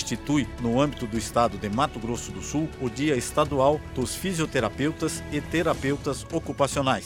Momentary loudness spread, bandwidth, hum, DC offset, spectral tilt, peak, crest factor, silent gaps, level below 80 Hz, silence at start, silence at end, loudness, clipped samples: 7 LU; 17 kHz; none; under 0.1%; -5 dB/octave; -8 dBFS; 18 dB; none; -44 dBFS; 0 s; 0 s; -26 LUFS; under 0.1%